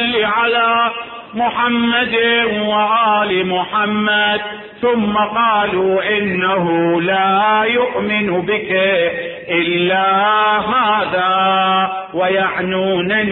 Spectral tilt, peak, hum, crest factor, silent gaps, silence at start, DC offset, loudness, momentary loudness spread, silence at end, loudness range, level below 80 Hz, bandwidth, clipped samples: -10 dB/octave; -4 dBFS; none; 12 dB; none; 0 s; under 0.1%; -15 LUFS; 5 LU; 0 s; 1 LU; -52 dBFS; 4.2 kHz; under 0.1%